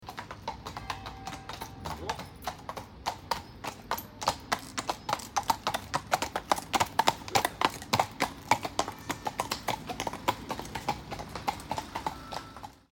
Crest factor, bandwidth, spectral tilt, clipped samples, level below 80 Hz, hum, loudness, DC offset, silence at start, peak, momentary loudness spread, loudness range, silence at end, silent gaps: 28 dB; 19 kHz; -3 dB/octave; under 0.1%; -54 dBFS; none; -33 LUFS; under 0.1%; 0 s; -6 dBFS; 12 LU; 9 LU; 0.15 s; none